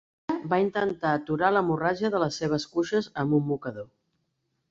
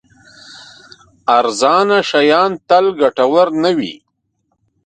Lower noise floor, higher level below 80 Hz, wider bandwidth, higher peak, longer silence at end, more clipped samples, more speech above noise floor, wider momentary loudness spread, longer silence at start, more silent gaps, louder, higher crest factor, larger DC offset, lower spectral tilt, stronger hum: first, -77 dBFS vs -67 dBFS; about the same, -62 dBFS vs -62 dBFS; second, 7.8 kHz vs 9.4 kHz; second, -8 dBFS vs 0 dBFS; about the same, 0.85 s vs 0.9 s; neither; about the same, 51 dB vs 54 dB; first, 9 LU vs 5 LU; second, 0.3 s vs 0.5 s; neither; second, -27 LUFS vs -13 LUFS; about the same, 20 dB vs 16 dB; neither; first, -6.5 dB/octave vs -4 dB/octave; neither